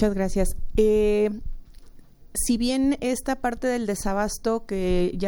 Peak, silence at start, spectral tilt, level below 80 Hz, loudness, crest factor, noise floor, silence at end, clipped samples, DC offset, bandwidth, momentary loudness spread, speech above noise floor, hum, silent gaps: -8 dBFS; 0 s; -5 dB/octave; -32 dBFS; -24 LUFS; 16 dB; -45 dBFS; 0 s; under 0.1%; under 0.1%; 18.5 kHz; 7 LU; 22 dB; none; none